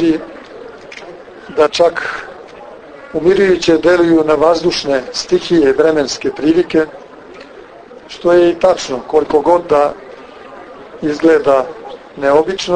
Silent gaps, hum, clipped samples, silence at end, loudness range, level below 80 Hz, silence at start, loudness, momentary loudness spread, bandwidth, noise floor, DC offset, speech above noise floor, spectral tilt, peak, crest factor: none; none; under 0.1%; 0 s; 3 LU; -46 dBFS; 0 s; -13 LUFS; 23 LU; 9.6 kHz; -36 dBFS; under 0.1%; 24 dB; -5 dB/octave; 0 dBFS; 14 dB